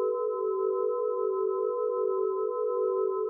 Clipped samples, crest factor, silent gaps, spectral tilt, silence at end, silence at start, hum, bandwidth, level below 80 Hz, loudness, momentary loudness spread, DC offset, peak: under 0.1%; 10 dB; none; 13 dB/octave; 0 s; 0 s; none; 1.4 kHz; under -90 dBFS; -29 LUFS; 1 LU; under 0.1%; -18 dBFS